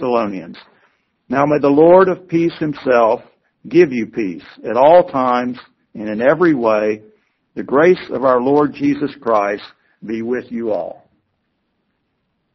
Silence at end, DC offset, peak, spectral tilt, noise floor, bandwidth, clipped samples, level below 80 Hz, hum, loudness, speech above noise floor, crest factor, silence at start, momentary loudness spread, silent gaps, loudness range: 1.6 s; under 0.1%; 0 dBFS; -5.5 dB/octave; -68 dBFS; 6.2 kHz; under 0.1%; -56 dBFS; none; -15 LUFS; 54 dB; 16 dB; 0 s; 17 LU; none; 6 LU